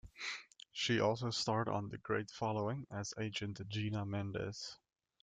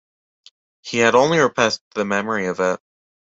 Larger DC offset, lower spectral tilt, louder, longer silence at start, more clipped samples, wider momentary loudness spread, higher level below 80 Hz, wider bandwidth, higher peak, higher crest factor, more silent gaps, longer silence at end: neither; about the same, -5 dB/octave vs -4 dB/octave; second, -39 LUFS vs -19 LUFS; second, 0.05 s vs 0.85 s; neither; about the same, 10 LU vs 10 LU; second, -68 dBFS vs -60 dBFS; first, 9.4 kHz vs 8 kHz; second, -20 dBFS vs -2 dBFS; about the same, 20 dB vs 18 dB; second, none vs 1.81-1.91 s; about the same, 0.45 s vs 0.5 s